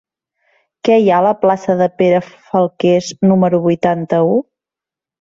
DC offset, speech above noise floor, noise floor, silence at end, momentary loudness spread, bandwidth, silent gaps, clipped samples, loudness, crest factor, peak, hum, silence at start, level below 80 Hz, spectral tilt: under 0.1%; 75 dB; -88 dBFS; 0.8 s; 5 LU; 7.8 kHz; none; under 0.1%; -14 LUFS; 14 dB; 0 dBFS; none; 0.85 s; -58 dBFS; -7 dB/octave